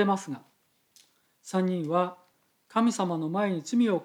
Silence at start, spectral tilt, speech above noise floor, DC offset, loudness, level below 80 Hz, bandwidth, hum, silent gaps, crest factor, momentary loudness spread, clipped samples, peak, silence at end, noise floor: 0 s; -6 dB/octave; 39 dB; under 0.1%; -28 LUFS; -90 dBFS; 13 kHz; none; none; 18 dB; 10 LU; under 0.1%; -12 dBFS; 0 s; -66 dBFS